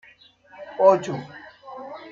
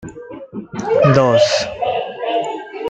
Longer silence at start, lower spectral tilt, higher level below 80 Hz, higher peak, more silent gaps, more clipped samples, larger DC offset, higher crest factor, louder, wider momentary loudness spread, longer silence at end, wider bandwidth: first, 0.6 s vs 0 s; about the same, -6.5 dB/octave vs -5.5 dB/octave; second, -72 dBFS vs -52 dBFS; second, -4 dBFS vs 0 dBFS; neither; neither; neither; first, 22 dB vs 16 dB; second, -21 LUFS vs -16 LUFS; first, 24 LU vs 19 LU; about the same, 0.05 s vs 0 s; second, 7.6 kHz vs 9 kHz